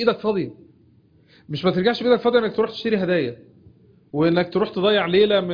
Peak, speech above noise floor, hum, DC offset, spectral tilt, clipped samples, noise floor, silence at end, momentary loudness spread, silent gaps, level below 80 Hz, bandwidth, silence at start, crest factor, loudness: -4 dBFS; 35 dB; none; under 0.1%; -8 dB/octave; under 0.1%; -55 dBFS; 0 s; 10 LU; none; -58 dBFS; 5.2 kHz; 0 s; 16 dB; -20 LUFS